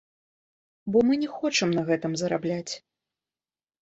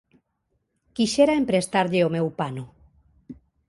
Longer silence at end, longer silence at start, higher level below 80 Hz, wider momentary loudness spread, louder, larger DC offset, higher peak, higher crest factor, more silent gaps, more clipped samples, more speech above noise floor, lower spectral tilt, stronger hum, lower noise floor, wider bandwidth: first, 1.05 s vs 0.35 s; second, 0.85 s vs 1 s; second, -66 dBFS vs -58 dBFS; second, 14 LU vs 18 LU; second, -26 LUFS vs -22 LUFS; neither; second, -10 dBFS vs -6 dBFS; about the same, 18 dB vs 20 dB; neither; neither; first, over 65 dB vs 52 dB; about the same, -4.5 dB/octave vs -5.5 dB/octave; neither; first, under -90 dBFS vs -74 dBFS; second, 8.2 kHz vs 11.5 kHz